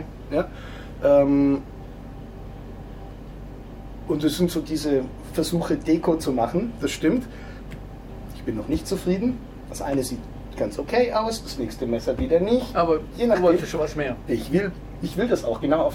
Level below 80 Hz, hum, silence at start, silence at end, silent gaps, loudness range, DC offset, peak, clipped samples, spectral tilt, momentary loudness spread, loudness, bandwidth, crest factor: -40 dBFS; none; 0 s; 0 s; none; 5 LU; under 0.1%; -6 dBFS; under 0.1%; -6 dB/octave; 19 LU; -24 LUFS; 16.5 kHz; 18 dB